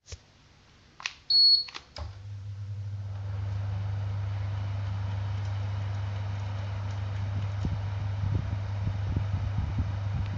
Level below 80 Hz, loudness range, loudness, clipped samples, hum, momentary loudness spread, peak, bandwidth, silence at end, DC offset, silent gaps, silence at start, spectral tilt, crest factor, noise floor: -42 dBFS; 8 LU; -29 LUFS; under 0.1%; none; 15 LU; -10 dBFS; 7.2 kHz; 0 s; under 0.1%; none; 0.1 s; -5 dB/octave; 20 dB; -58 dBFS